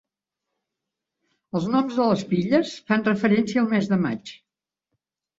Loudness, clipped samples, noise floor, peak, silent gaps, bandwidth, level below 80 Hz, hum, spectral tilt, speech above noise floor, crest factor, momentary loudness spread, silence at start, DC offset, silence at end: -22 LUFS; under 0.1%; -87 dBFS; -4 dBFS; none; 7.8 kHz; -64 dBFS; none; -7 dB/octave; 65 dB; 20 dB; 8 LU; 1.55 s; under 0.1%; 1.05 s